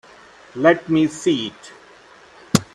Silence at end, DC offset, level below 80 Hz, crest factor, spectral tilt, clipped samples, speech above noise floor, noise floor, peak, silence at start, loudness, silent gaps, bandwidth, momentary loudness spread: 0.1 s; under 0.1%; -58 dBFS; 22 dB; -5 dB/octave; under 0.1%; 28 dB; -47 dBFS; 0 dBFS; 0.55 s; -19 LUFS; none; 13.5 kHz; 11 LU